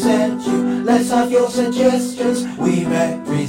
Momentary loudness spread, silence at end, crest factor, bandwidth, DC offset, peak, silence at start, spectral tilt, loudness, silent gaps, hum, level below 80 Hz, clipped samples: 4 LU; 0 s; 14 dB; 16 kHz; under 0.1%; -2 dBFS; 0 s; -5.5 dB/octave; -17 LUFS; none; none; -54 dBFS; under 0.1%